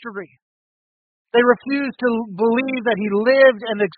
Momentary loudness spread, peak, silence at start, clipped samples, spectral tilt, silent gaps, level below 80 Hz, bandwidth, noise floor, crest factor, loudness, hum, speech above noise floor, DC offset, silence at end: 9 LU; -2 dBFS; 0 s; under 0.1%; -3 dB/octave; 0.42-1.25 s; -66 dBFS; 4.8 kHz; under -90 dBFS; 18 dB; -18 LUFS; none; over 72 dB; under 0.1%; 0.1 s